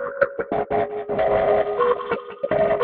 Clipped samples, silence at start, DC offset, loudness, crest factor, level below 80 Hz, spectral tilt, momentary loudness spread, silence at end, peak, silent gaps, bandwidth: under 0.1%; 0 s; under 0.1%; -22 LUFS; 18 dB; -50 dBFS; -9.5 dB/octave; 6 LU; 0 s; -4 dBFS; none; 4.7 kHz